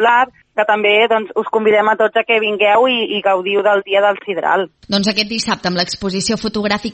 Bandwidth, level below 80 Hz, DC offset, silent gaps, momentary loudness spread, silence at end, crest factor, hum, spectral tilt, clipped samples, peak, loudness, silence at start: 8.8 kHz; -52 dBFS; under 0.1%; none; 6 LU; 0 s; 14 dB; none; -3.5 dB/octave; under 0.1%; 0 dBFS; -15 LUFS; 0 s